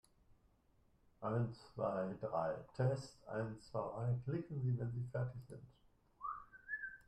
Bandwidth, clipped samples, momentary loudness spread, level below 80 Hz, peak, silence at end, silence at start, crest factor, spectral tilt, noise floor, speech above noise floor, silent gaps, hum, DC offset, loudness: 10.5 kHz; under 0.1%; 9 LU; -70 dBFS; -26 dBFS; 0.1 s; 0.3 s; 18 dB; -8 dB/octave; -74 dBFS; 32 dB; none; none; under 0.1%; -43 LUFS